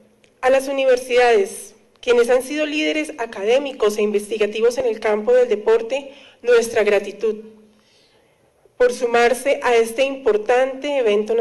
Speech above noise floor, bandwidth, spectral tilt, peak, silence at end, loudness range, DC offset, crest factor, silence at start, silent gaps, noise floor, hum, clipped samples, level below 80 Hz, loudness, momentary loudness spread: 40 dB; 12.5 kHz; -3 dB/octave; -8 dBFS; 0 s; 2 LU; under 0.1%; 10 dB; 0.4 s; none; -57 dBFS; none; under 0.1%; -54 dBFS; -18 LUFS; 9 LU